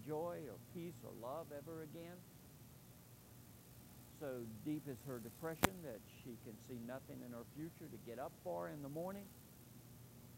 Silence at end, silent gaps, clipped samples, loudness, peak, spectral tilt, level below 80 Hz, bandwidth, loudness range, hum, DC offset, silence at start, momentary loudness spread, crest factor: 0 s; none; under 0.1%; -49 LUFS; -12 dBFS; -5 dB/octave; -70 dBFS; 16 kHz; 8 LU; none; under 0.1%; 0 s; 15 LU; 36 dB